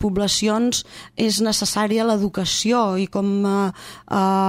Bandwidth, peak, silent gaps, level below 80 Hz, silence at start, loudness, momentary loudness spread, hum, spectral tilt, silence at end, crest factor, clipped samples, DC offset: 16 kHz; -8 dBFS; none; -48 dBFS; 0 s; -20 LUFS; 7 LU; none; -4 dB/octave; 0 s; 12 dB; under 0.1%; under 0.1%